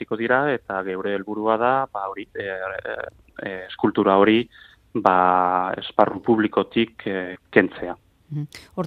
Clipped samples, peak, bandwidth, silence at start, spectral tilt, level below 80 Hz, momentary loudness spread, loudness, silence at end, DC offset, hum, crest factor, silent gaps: under 0.1%; 0 dBFS; 9 kHz; 0 s; -7.5 dB/octave; -60 dBFS; 15 LU; -22 LUFS; 0 s; under 0.1%; none; 22 dB; none